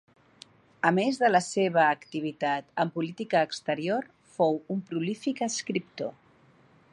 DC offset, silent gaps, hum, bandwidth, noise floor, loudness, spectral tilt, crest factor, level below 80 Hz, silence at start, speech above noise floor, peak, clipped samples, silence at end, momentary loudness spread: under 0.1%; none; none; 11.5 kHz; -60 dBFS; -28 LUFS; -4.5 dB/octave; 22 dB; -78 dBFS; 0.85 s; 33 dB; -6 dBFS; under 0.1%; 0.8 s; 10 LU